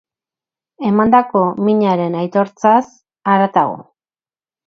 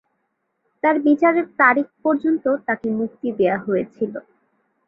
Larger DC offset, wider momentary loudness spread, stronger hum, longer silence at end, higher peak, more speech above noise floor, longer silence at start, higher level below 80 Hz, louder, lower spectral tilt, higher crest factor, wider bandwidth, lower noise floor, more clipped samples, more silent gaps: neither; about the same, 10 LU vs 10 LU; neither; first, 0.85 s vs 0.65 s; about the same, 0 dBFS vs -2 dBFS; first, over 76 dB vs 53 dB; about the same, 0.8 s vs 0.85 s; first, -56 dBFS vs -66 dBFS; first, -15 LUFS vs -20 LUFS; about the same, -8 dB/octave vs -9 dB/octave; about the same, 16 dB vs 18 dB; first, 6.8 kHz vs 4.1 kHz; first, under -90 dBFS vs -73 dBFS; neither; neither